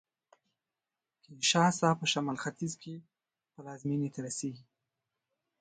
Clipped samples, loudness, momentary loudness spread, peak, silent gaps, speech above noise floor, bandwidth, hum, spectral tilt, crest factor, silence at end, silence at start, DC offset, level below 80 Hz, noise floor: under 0.1%; -31 LUFS; 22 LU; -14 dBFS; none; over 58 dB; 9.6 kHz; none; -4 dB/octave; 22 dB; 1 s; 1.3 s; under 0.1%; -78 dBFS; under -90 dBFS